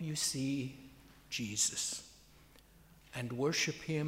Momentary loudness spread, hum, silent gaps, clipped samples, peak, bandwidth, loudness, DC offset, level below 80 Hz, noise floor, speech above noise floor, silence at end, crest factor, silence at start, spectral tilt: 14 LU; none; none; under 0.1%; -20 dBFS; 16 kHz; -36 LUFS; under 0.1%; -66 dBFS; -62 dBFS; 25 dB; 0 s; 20 dB; 0 s; -3 dB/octave